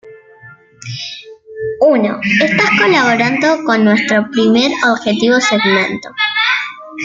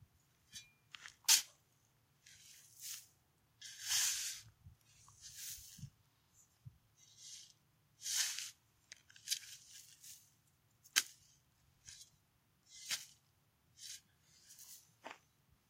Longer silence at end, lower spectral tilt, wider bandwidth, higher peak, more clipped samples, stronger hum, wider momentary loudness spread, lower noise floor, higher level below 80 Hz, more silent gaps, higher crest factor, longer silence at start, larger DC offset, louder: second, 0 s vs 0.55 s; first, -4.5 dB/octave vs 2 dB/octave; second, 7.6 kHz vs 16.5 kHz; first, 0 dBFS vs -8 dBFS; neither; neither; second, 15 LU vs 25 LU; second, -41 dBFS vs -76 dBFS; first, -58 dBFS vs -80 dBFS; neither; second, 12 dB vs 38 dB; second, 0.05 s vs 0.55 s; neither; first, -12 LUFS vs -38 LUFS